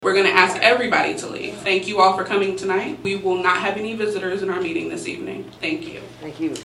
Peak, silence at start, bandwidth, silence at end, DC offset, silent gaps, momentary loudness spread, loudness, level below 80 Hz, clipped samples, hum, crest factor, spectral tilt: 0 dBFS; 0 s; 12 kHz; 0 s; under 0.1%; none; 14 LU; -20 LUFS; -58 dBFS; under 0.1%; none; 20 dB; -4 dB/octave